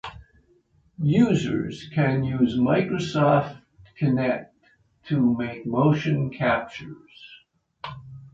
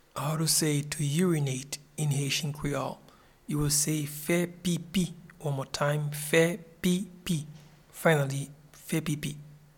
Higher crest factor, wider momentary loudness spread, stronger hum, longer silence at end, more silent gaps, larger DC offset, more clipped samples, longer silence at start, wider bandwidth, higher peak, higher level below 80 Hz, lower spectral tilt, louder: about the same, 18 dB vs 20 dB; first, 19 LU vs 13 LU; neither; second, 0.05 s vs 0.2 s; neither; neither; neither; about the same, 0.05 s vs 0.15 s; second, 7.8 kHz vs 18.5 kHz; first, -6 dBFS vs -10 dBFS; about the same, -54 dBFS vs -56 dBFS; first, -7.5 dB/octave vs -4.5 dB/octave; first, -23 LUFS vs -29 LUFS